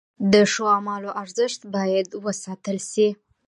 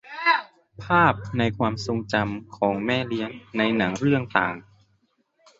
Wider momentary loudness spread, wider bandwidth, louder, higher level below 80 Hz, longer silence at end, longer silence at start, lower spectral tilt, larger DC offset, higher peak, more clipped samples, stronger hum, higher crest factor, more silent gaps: about the same, 12 LU vs 10 LU; first, 11.5 kHz vs 8 kHz; about the same, -22 LUFS vs -24 LUFS; second, -64 dBFS vs -52 dBFS; second, 0.35 s vs 1 s; first, 0.2 s vs 0.05 s; second, -4.5 dB/octave vs -6 dB/octave; neither; about the same, -4 dBFS vs -2 dBFS; neither; neither; about the same, 20 dB vs 22 dB; neither